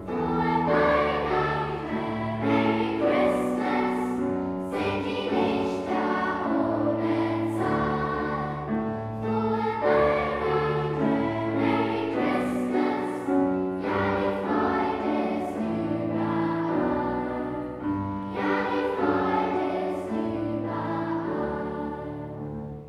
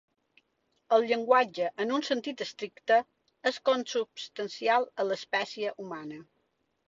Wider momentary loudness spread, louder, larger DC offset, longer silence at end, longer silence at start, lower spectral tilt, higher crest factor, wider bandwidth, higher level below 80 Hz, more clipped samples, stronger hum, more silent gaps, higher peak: second, 6 LU vs 13 LU; first, -26 LUFS vs -29 LUFS; neither; second, 0 s vs 0.65 s; second, 0 s vs 0.9 s; first, -7.5 dB/octave vs -3.5 dB/octave; about the same, 16 dB vs 20 dB; first, 12.5 kHz vs 7.8 kHz; first, -50 dBFS vs -78 dBFS; neither; neither; neither; about the same, -10 dBFS vs -10 dBFS